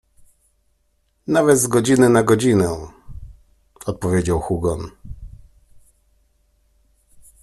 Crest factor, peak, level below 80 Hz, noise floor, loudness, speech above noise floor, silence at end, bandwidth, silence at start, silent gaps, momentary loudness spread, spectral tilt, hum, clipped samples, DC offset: 20 dB; -2 dBFS; -42 dBFS; -65 dBFS; -17 LUFS; 48 dB; 2.15 s; 13 kHz; 1.3 s; none; 24 LU; -5.5 dB/octave; none; under 0.1%; under 0.1%